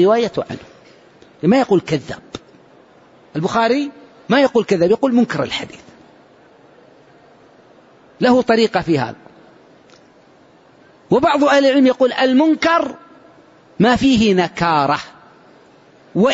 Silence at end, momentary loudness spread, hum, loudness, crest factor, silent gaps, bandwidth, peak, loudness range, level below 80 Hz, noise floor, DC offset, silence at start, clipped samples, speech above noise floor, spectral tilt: 0 s; 15 LU; none; -16 LUFS; 14 dB; none; 8 kHz; -4 dBFS; 6 LU; -50 dBFS; -49 dBFS; under 0.1%; 0 s; under 0.1%; 34 dB; -6 dB/octave